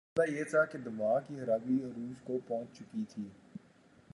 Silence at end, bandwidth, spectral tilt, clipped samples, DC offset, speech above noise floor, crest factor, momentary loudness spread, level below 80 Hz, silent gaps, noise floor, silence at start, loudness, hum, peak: 0.55 s; 11.5 kHz; -7 dB/octave; under 0.1%; under 0.1%; 28 dB; 18 dB; 15 LU; -76 dBFS; none; -63 dBFS; 0.15 s; -35 LUFS; none; -16 dBFS